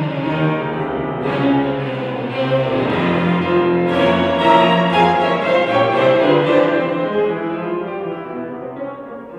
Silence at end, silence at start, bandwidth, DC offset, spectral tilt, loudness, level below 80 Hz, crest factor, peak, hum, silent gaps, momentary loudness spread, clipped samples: 0 s; 0 s; 9.6 kHz; under 0.1%; -7.5 dB/octave; -16 LUFS; -52 dBFS; 16 dB; 0 dBFS; none; none; 13 LU; under 0.1%